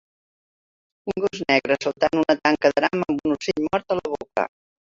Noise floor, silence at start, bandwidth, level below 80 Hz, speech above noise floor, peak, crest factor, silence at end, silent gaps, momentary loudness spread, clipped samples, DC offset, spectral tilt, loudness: under -90 dBFS; 1.05 s; 7.6 kHz; -58 dBFS; over 68 dB; -2 dBFS; 20 dB; 0.4 s; none; 8 LU; under 0.1%; under 0.1%; -5 dB/octave; -22 LUFS